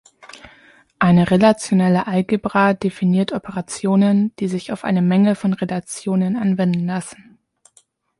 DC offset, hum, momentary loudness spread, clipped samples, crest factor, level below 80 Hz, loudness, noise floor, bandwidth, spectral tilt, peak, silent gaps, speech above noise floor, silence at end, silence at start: under 0.1%; none; 10 LU; under 0.1%; 18 dB; -54 dBFS; -18 LUFS; -57 dBFS; 11.5 kHz; -7 dB/octave; -2 dBFS; none; 40 dB; 1.05 s; 0.35 s